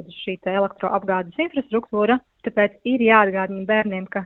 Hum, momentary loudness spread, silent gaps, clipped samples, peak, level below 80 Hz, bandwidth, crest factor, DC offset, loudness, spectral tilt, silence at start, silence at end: none; 10 LU; none; under 0.1%; 0 dBFS; -60 dBFS; 4.2 kHz; 20 dB; under 0.1%; -21 LUFS; -8.5 dB/octave; 0 s; 0 s